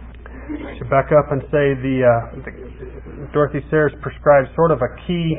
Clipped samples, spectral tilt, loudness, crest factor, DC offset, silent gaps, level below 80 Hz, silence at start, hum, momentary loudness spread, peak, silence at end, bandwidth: under 0.1%; -12.5 dB/octave; -17 LUFS; 18 dB; under 0.1%; none; -36 dBFS; 0 s; none; 20 LU; 0 dBFS; 0 s; 3.8 kHz